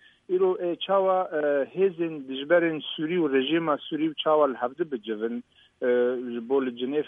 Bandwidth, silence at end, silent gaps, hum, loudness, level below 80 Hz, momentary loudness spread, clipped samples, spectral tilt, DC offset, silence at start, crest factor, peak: 3.8 kHz; 0 s; none; none; -26 LUFS; -78 dBFS; 8 LU; under 0.1%; -8 dB/octave; under 0.1%; 0.3 s; 16 dB; -10 dBFS